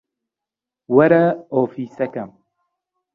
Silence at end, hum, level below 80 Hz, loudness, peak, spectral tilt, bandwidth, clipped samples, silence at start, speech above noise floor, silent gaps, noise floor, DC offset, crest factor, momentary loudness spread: 0.9 s; none; -66 dBFS; -18 LUFS; -2 dBFS; -10 dB/octave; 4.9 kHz; under 0.1%; 0.9 s; 70 dB; none; -87 dBFS; under 0.1%; 18 dB; 15 LU